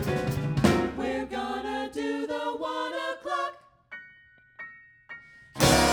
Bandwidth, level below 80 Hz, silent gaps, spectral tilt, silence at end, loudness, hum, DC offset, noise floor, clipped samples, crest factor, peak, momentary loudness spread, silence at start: over 20 kHz; -46 dBFS; none; -4.5 dB/octave; 0 s; -28 LUFS; none; under 0.1%; -57 dBFS; under 0.1%; 24 dB; -4 dBFS; 21 LU; 0 s